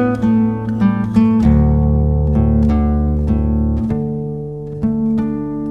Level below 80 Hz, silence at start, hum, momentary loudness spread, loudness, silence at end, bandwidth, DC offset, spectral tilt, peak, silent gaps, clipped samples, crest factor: -20 dBFS; 0 s; none; 9 LU; -16 LUFS; 0 s; 4.7 kHz; 0.5%; -10.5 dB/octave; 0 dBFS; none; under 0.1%; 14 dB